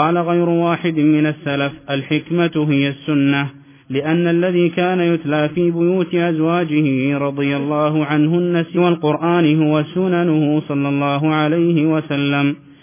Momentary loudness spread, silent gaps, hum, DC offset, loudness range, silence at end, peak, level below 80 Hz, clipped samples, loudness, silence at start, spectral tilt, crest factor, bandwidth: 4 LU; none; none; under 0.1%; 2 LU; 0.25 s; -2 dBFS; -60 dBFS; under 0.1%; -17 LUFS; 0 s; -11.5 dB/octave; 14 dB; 3.6 kHz